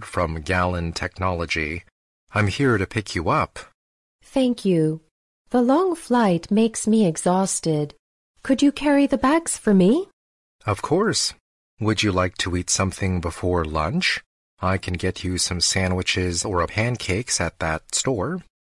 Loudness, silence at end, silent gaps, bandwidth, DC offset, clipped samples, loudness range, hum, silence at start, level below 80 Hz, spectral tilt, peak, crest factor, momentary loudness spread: -22 LUFS; 0.2 s; 1.92-2.27 s, 3.74-4.19 s, 5.11-5.45 s, 7.99-8.34 s, 10.13-10.59 s, 11.40-11.77 s, 14.26-14.57 s; 12 kHz; under 0.1%; under 0.1%; 3 LU; none; 0 s; -46 dBFS; -4.5 dB/octave; -8 dBFS; 14 dB; 8 LU